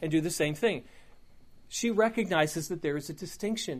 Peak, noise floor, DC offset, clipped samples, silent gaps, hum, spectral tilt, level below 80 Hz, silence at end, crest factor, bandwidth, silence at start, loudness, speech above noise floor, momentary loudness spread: -10 dBFS; -52 dBFS; under 0.1%; under 0.1%; none; none; -4.5 dB/octave; -60 dBFS; 0 s; 20 dB; 15.5 kHz; 0 s; -30 LUFS; 22 dB; 10 LU